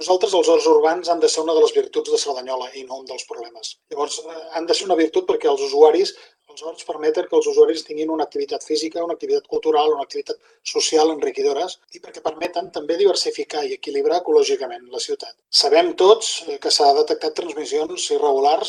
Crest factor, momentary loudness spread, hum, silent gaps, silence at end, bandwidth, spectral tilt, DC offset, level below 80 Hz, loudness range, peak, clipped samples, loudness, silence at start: 20 dB; 15 LU; none; none; 0 s; 12 kHz; -1.5 dB/octave; under 0.1%; -72 dBFS; 5 LU; 0 dBFS; under 0.1%; -19 LUFS; 0 s